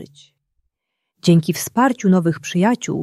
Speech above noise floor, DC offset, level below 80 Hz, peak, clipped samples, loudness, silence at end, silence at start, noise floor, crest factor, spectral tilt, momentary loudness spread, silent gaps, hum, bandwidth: 61 dB; under 0.1%; -62 dBFS; -2 dBFS; under 0.1%; -17 LUFS; 0 s; 0 s; -78 dBFS; 16 dB; -6 dB/octave; 5 LU; none; none; 14 kHz